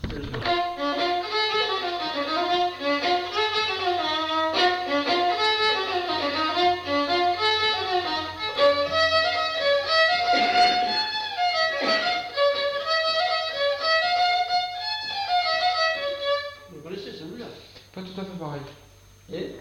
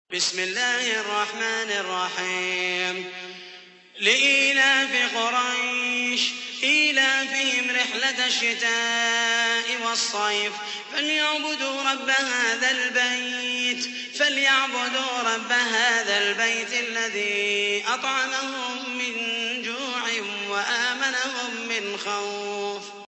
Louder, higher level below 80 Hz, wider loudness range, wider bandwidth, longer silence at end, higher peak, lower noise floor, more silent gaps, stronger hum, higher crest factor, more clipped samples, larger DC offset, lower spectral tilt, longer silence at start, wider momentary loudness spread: about the same, -23 LUFS vs -22 LUFS; first, -52 dBFS vs -82 dBFS; about the same, 6 LU vs 5 LU; first, 16 kHz vs 8.4 kHz; about the same, 0 s vs 0 s; about the same, -8 dBFS vs -6 dBFS; first, -51 dBFS vs -46 dBFS; neither; neither; about the same, 16 dB vs 20 dB; neither; neither; first, -3.5 dB/octave vs 0 dB/octave; about the same, 0 s vs 0.1 s; first, 15 LU vs 9 LU